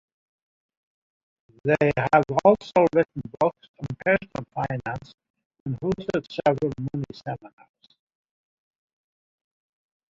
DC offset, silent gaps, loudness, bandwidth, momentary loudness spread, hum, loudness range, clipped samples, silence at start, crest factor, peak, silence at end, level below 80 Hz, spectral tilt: under 0.1%; 3.69-3.74 s, 5.14-5.18 s, 5.30-5.34 s, 5.46-5.50 s, 5.60-5.66 s; -24 LUFS; 7.6 kHz; 16 LU; none; 9 LU; under 0.1%; 1.65 s; 22 dB; -4 dBFS; 2.65 s; -56 dBFS; -7.5 dB/octave